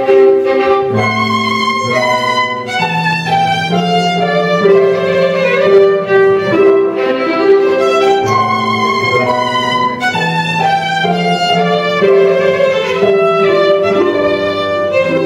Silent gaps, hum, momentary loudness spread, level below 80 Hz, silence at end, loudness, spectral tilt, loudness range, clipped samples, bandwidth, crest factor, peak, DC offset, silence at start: none; none; 4 LU; -54 dBFS; 0 s; -11 LUFS; -5.5 dB/octave; 2 LU; under 0.1%; 10.5 kHz; 10 dB; 0 dBFS; under 0.1%; 0 s